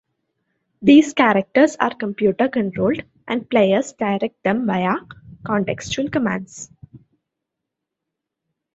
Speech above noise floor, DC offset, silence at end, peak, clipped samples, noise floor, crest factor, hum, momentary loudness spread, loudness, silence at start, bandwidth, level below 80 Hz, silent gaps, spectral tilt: 64 dB; under 0.1%; 1.75 s; 0 dBFS; under 0.1%; -82 dBFS; 20 dB; none; 13 LU; -19 LUFS; 0.8 s; 8 kHz; -56 dBFS; none; -5.5 dB/octave